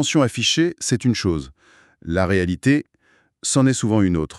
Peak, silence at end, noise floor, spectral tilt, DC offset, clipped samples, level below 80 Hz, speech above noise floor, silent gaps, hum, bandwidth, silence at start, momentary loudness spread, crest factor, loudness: -4 dBFS; 0 s; -60 dBFS; -4.5 dB/octave; under 0.1%; under 0.1%; -44 dBFS; 41 dB; none; none; 12.5 kHz; 0 s; 8 LU; 16 dB; -20 LUFS